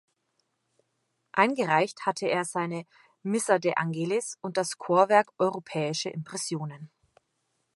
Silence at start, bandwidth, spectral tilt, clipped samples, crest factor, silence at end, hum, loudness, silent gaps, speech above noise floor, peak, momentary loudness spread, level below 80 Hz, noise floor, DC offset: 1.35 s; 11.5 kHz; -4.5 dB/octave; under 0.1%; 24 dB; 0.9 s; none; -27 LUFS; none; 50 dB; -6 dBFS; 11 LU; -80 dBFS; -77 dBFS; under 0.1%